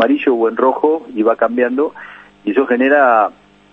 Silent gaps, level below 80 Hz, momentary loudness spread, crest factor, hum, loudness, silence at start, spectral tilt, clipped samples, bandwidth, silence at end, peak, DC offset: none; -62 dBFS; 9 LU; 14 dB; 50 Hz at -55 dBFS; -14 LUFS; 0 s; -7 dB/octave; under 0.1%; 5.4 kHz; 0.4 s; 0 dBFS; under 0.1%